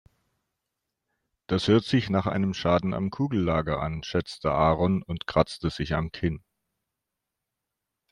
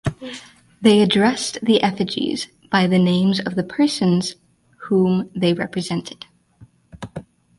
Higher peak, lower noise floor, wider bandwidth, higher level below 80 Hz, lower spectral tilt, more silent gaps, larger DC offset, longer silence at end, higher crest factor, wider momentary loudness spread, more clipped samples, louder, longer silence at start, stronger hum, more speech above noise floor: second, -8 dBFS vs -2 dBFS; first, -85 dBFS vs -50 dBFS; about the same, 11 kHz vs 11.5 kHz; first, -48 dBFS vs -54 dBFS; first, -7 dB/octave vs -5.5 dB/octave; neither; neither; first, 1.75 s vs 0.35 s; about the same, 20 dB vs 18 dB; second, 7 LU vs 19 LU; neither; second, -26 LUFS vs -19 LUFS; first, 1.5 s vs 0.05 s; neither; first, 60 dB vs 32 dB